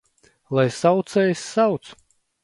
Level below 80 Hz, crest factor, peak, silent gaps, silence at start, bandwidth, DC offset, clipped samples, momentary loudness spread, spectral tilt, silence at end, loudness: -66 dBFS; 18 dB; -4 dBFS; none; 0.5 s; 11.5 kHz; under 0.1%; under 0.1%; 5 LU; -6 dB/octave; 0.5 s; -21 LUFS